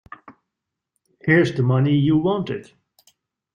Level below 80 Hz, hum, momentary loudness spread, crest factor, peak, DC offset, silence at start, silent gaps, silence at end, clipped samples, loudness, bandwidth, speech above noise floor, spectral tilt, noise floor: -58 dBFS; none; 12 LU; 20 dB; -2 dBFS; under 0.1%; 0.3 s; none; 0.95 s; under 0.1%; -19 LUFS; 9 kHz; 64 dB; -8 dB/octave; -83 dBFS